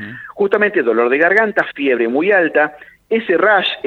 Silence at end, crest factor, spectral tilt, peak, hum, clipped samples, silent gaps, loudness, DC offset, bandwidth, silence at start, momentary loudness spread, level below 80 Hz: 0.05 s; 14 dB; -6 dB/octave; 0 dBFS; none; under 0.1%; none; -14 LUFS; under 0.1%; 6.8 kHz; 0 s; 8 LU; -62 dBFS